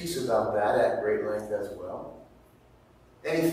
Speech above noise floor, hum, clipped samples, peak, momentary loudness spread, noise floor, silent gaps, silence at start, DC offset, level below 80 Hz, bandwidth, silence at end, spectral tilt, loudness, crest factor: 30 dB; none; under 0.1%; -12 dBFS; 14 LU; -57 dBFS; none; 0 s; under 0.1%; -60 dBFS; 16 kHz; 0 s; -5 dB/octave; -28 LUFS; 16 dB